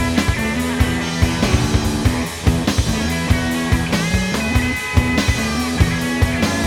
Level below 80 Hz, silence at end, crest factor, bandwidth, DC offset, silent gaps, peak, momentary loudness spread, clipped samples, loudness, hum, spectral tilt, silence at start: -26 dBFS; 0 s; 16 dB; 18 kHz; under 0.1%; none; 0 dBFS; 2 LU; under 0.1%; -18 LUFS; none; -5 dB/octave; 0 s